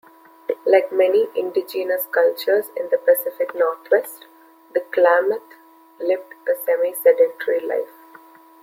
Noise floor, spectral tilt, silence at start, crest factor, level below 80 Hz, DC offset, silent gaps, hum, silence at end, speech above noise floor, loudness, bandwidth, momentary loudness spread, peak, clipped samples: -47 dBFS; -2.5 dB/octave; 0.5 s; 18 dB; -76 dBFS; under 0.1%; none; none; 0.75 s; 27 dB; -20 LUFS; 16.5 kHz; 11 LU; -2 dBFS; under 0.1%